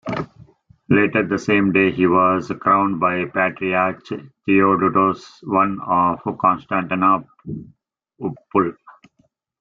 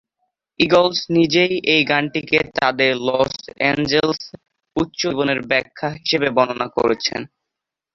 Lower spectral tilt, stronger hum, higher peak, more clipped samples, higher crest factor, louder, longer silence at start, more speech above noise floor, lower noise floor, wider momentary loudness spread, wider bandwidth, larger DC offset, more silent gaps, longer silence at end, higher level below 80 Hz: first, -7.5 dB/octave vs -4.5 dB/octave; neither; about the same, -2 dBFS vs 0 dBFS; neither; about the same, 16 dB vs 18 dB; about the same, -18 LUFS vs -18 LUFS; second, 0.05 s vs 0.6 s; second, 45 dB vs 65 dB; second, -63 dBFS vs -83 dBFS; first, 14 LU vs 9 LU; about the same, 7.6 kHz vs 7.4 kHz; neither; neither; first, 0.9 s vs 0.7 s; about the same, -56 dBFS vs -52 dBFS